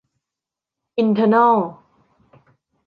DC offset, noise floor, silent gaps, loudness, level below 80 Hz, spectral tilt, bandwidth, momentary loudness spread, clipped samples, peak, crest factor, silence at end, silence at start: under 0.1%; -86 dBFS; none; -17 LUFS; -68 dBFS; -9 dB/octave; 5.2 kHz; 15 LU; under 0.1%; -4 dBFS; 18 dB; 1.15 s; 0.95 s